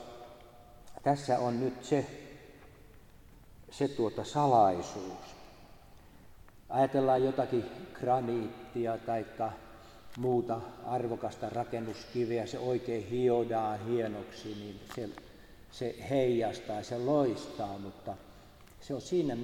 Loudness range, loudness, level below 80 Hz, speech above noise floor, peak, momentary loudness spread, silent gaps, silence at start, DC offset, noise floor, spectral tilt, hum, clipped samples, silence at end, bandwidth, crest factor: 4 LU; -33 LUFS; -62 dBFS; 23 dB; -14 dBFS; 20 LU; none; 0 s; under 0.1%; -55 dBFS; -6.5 dB/octave; none; under 0.1%; 0 s; 16.5 kHz; 20 dB